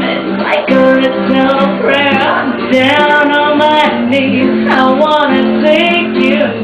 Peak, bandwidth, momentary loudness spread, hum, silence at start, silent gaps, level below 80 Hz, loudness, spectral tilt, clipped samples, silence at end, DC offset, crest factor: 0 dBFS; 9.6 kHz; 4 LU; none; 0 s; none; -48 dBFS; -10 LUFS; -6 dB/octave; under 0.1%; 0 s; under 0.1%; 10 dB